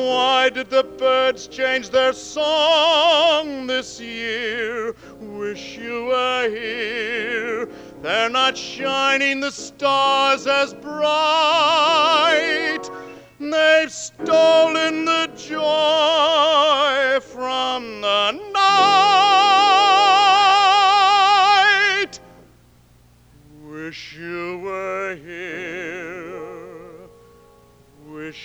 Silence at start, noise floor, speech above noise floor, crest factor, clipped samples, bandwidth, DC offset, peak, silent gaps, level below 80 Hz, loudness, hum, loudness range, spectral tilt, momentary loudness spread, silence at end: 0 s; -52 dBFS; 33 dB; 16 dB; under 0.1%; 11 kHz; under 0.1%; -2 dBFS; none; -58 dBFS; -17 LUFS; 60 Hz at -55 dBFS; 16 LU; -2 dB/octave; 17 LU; 0 s